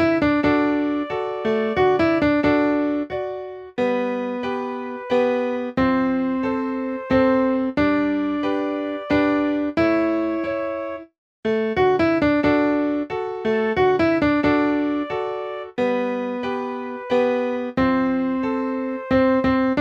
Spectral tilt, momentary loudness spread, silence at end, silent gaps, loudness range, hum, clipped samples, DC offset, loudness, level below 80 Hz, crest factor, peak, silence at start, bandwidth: -7.5 dB/octave; 9 LU; 0 s; 11.18-11.43 s; 3 LU; none; under 0.1%; under 0.1%; -21 LUFS; -46 dBFS; 14 dB; -6 dBFS; 0 s; 7 kHz